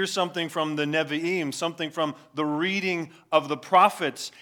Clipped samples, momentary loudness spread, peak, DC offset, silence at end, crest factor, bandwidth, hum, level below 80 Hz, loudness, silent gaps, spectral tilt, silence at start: under 0.1%; 10 LU; -6 dBFS; under 0.1%; 0.15 s; 20 dB; 18.5 kHz; none; -84 dBFS; -25 LUFS; none; -4 dB/octave; 0 s